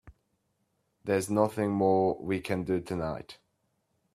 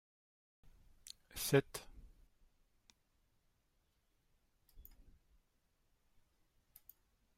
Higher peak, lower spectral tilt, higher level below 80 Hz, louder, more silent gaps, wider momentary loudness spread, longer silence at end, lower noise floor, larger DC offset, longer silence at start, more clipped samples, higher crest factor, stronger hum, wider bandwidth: first, -10 dBFS vs -18 dBFS; first, -6.5 dB/octave vs -4.5 dB/octave; first, -62 dBFS vs -68 dBFS; first, -29 LUFS vs -38 LUFS; neither; second, 13 LU vs 27 LU; second, 0.8 s vs 2.55 s; second, -76 dBFS vs -80 dBFS; neither; second, 0.05 s vs 1.35 s; neither; second, 20 dB vs 30 dB; neither; second, 14.5 kHz vs 16 kHz